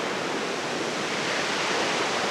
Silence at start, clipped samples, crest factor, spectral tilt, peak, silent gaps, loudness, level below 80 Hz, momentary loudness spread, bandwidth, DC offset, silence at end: 0 s; under 0.1%; 14 dB; -2.5 dB/octave; -14 dBFS; none; -26 LUFS; -70 dBFS; 4 LU; 15 kHz; under 0.1%; 0 s